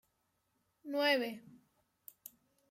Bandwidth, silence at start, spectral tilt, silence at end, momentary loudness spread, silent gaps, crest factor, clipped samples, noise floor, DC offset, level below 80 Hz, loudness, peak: 16.5 kHz; 0.85 s; -3 dB/octave; 1.2 s; 25 LU; none; 20 dB; under 0.1%; -81 dBFS; under 0.1%; -90 dBFS; -34 LUFS; -20 dBFS